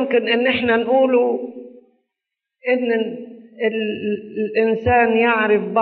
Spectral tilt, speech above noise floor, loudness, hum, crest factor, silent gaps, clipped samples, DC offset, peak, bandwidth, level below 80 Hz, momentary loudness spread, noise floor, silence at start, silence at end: -3 dB/octave; 65 dB; -18 LUFS; none; 14 dB; none; under 0.1%; under 0.1%; -4 dBFS; 4.7 kHz; -52 dBFS; 12 LU; -83 dBFS; 0 s; 0 s